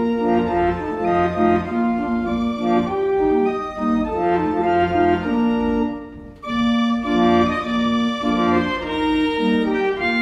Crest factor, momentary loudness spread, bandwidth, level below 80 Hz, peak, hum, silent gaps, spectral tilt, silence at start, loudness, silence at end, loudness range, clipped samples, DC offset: 14 dB; 4 LU; 7.8 kHz; -42 dBFS; -4 dBFS; none; none; -7 dB/octave; 0 s; -19 LUFS; 0 s; 1 LU; under 0.1%; under 0.1%